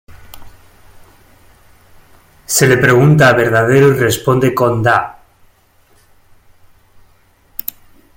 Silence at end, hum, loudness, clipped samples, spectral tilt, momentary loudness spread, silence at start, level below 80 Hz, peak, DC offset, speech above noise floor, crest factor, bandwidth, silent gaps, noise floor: 3.05 s; none; -11 LUFS; under 0.1%; -5 dB/octave; 16 LU; 0.1 s; -46 dBFS; 0 dBFS; under 0.1%; 41 dB; 16 dB; 17 kHz; none; -51 dBFS